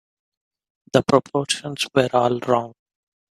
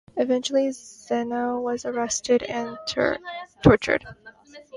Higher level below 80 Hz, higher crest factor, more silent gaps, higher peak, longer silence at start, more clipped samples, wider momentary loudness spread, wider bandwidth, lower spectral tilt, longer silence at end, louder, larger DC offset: second, -60 dBFS vs -46 dBFS; about the same, 22 dB vs 24 dB; neither; about the same, 0 dBFS vs 0 dBFS; first, 0.95 s vs 0.15 s; neither; second, 5 LU vs 11 LU; first, 14.5 kHz vs 11.5 kHz; about the same, -4.5 dB/octave vs -5 dB/octave; first, 0.6 s vs 0 s; first, -21 LUFS vs -24 LUFS; neither